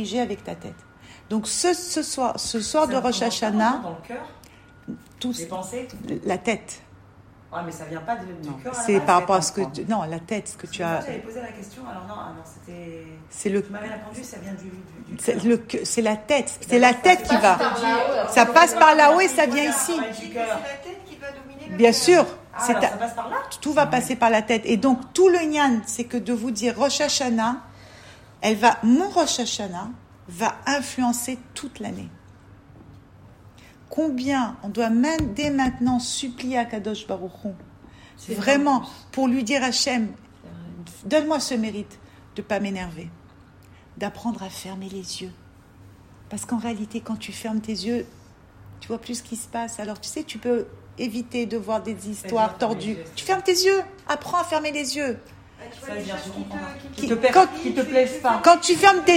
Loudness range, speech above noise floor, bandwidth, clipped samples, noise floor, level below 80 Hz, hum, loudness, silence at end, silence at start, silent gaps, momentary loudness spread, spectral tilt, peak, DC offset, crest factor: 13 LU; 27 dB; 16 kHz; under 0.1%; -49 dBFS; -54 dBFS; none; -22 LUFS; 0 s; 0 s; none; 20 LU; -3.5 dB/octave; 0 dBFS; under 0.1%; 22 dB